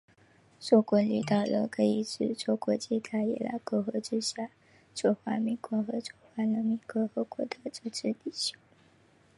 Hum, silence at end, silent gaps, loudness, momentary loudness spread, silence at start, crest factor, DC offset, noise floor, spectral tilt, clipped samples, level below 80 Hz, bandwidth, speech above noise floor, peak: none; 0.85 s; none; -31 LUFS; 10 LU; 0.6 s; 22 dB; under 0.1%; -63 dBFS; -5.5 dB/octave; under 0.1%; -76 dBFS; 11.5 kHz; 33 dB; -10 dBFS